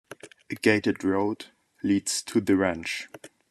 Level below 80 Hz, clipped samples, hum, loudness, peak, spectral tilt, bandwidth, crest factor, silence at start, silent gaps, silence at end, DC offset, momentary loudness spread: -66 dBFS; under 0.1%; none; -26 LUFS; -6 dBFS; -4.5 dB/octave; 13.5 kHz; 22 dB; 0.1 s; none; 0.25 s; under 0.1%; 20 LU